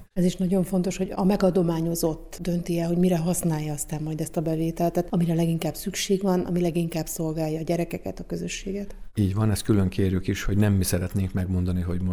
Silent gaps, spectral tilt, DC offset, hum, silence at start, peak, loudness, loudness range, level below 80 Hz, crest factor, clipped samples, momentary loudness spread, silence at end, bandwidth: none; -6.5 dB/octave; under 0.1%; none; 0 s; -8 dBFS; -25 LUFS; 3 LU; -42 dBFS; 16 dB; under 0.1%; 8 LU; 0 s; 19 kHz